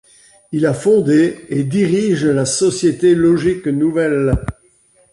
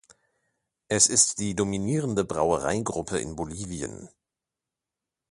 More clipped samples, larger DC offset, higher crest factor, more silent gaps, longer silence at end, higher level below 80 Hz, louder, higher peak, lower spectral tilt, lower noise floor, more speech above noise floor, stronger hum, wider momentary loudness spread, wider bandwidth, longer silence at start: neither; neither; second, 12 dB vs 24 dB; neither; second, 0.6 s vs 1.25 s; first, -36 dBFS vs -52 dBFS; first, -15 LUFS vs -25 LUFS; about the same, -4 dBFS vs -4 dBFS; first, -6 dB/octave vs -3.5 dB/octave; second, -54 dBFS vs -88 dBFS; second, 39 dB vs 62 dB; neither; second, 6 LU vs 15 LU; about the same, 11.5 kHz vs 11.5 kHz; second, 0.5 s vs 0.9 s